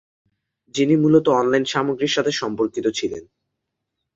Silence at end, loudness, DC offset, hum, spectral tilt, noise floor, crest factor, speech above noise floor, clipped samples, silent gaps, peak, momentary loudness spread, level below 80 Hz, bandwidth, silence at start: 0.95 s; -20 LUFS; under 0.1%; none; -5 dB/octave; -79 dBFS; 18 dB; 60 dB; under 0.1%; none; -4 dBFS; 12 LU; -60 dBFS; 7.8 kHz; 0.75 s